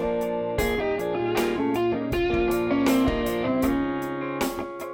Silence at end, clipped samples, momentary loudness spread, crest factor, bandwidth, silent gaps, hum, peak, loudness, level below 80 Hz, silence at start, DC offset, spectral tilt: 0 s; under 0.1%; 6 LU; 14 dB; 19 kHz; none; none; -10 dBFS; -25 LUFS; -40 dBFS; 0 s; under 0.1%; -5.5 dB/octave